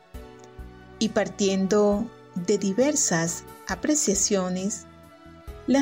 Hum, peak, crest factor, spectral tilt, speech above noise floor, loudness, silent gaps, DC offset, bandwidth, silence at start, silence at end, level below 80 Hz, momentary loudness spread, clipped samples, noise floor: none; -12 dBFS; 14 dB; -4 dB/octave; 24 dB; -24 LUFS; none; under 0.1%; 16 kHz; 0.15 s; 0 s; -48 dBFS; 23 LU; under 0.1%; -48 dBFS